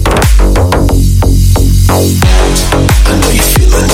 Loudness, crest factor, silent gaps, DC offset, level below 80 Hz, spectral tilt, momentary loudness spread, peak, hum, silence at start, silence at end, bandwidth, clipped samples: -8 LUFS; 6 dB; none; under 0.1%; -8 dBFS; -5 dB/octave; 2 LU; 0 dBFS; none; 0 s; 0 s; 17 kHz; 3%